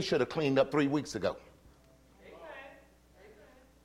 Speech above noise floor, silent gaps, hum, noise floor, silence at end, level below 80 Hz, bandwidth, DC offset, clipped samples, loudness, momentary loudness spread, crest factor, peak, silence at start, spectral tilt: 31 dB; none; none; -61 dBFS; 0.55 s; -64 dBFS; 13.5 kHz; under 0.1%; under 0.1%; -31 LUFS; 21 LU; 20 dB; -14 dBFS; 0 s; -5.5 dB/octave